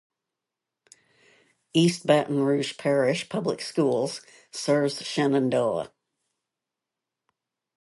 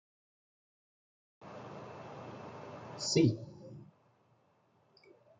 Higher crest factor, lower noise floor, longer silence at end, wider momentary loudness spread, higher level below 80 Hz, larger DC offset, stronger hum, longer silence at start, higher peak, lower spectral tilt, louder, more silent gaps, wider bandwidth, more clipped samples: about the same, 20 dB vs 24 dB; first, -87 dBFS vs -71 dBFS; first, 1.95 s vs 1.5 s; second, 10 LU vs 24 LU; about the same, -72 dBFS vs -74 dBFS; neither; neither; first, 1.75 s vs 1.4 s; first, -8 dBFS vs -16 dBFS; about the same, -5.5 dB/octave vs -5 dB/octave; first, -25 LUFS vs -33 LUFS; neither; first, 11.5 kHz vs 8.8 kHz; neither